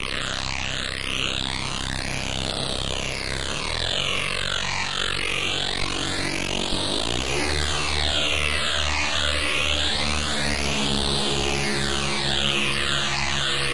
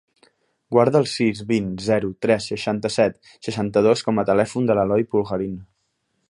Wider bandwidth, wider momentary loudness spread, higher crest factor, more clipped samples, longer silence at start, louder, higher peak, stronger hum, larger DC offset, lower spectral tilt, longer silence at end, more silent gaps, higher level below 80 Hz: about the same, 11.5 kHz vs 11.5 kHz; second, 5 LU vs 8 LU; about the same, 18 dB vs 20 dB; neither; second, 0 s vs 0.7 s; about the same, -23 LUFS vs -21 LUFS; second, -8 dBFS vs -2 dBFS; neither; first, 2% vs under 0.1%; second, -2.5 dB/octave vs -6 dB/octave; second, 0 s vs 0.65 s; neither; first, -36 dBFS vs -54 dBFS